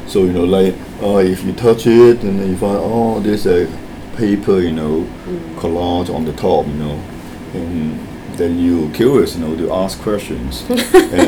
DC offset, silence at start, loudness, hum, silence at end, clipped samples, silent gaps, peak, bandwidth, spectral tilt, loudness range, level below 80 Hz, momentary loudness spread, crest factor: under 0.1%; 0 s; -15 LUFS; none; 0 s; 0.2%; none; 0 dBFS; 18.5 kHz; -6.5 dB/octave; 6 LU; -36 dBFS; 14 LU; 14 dB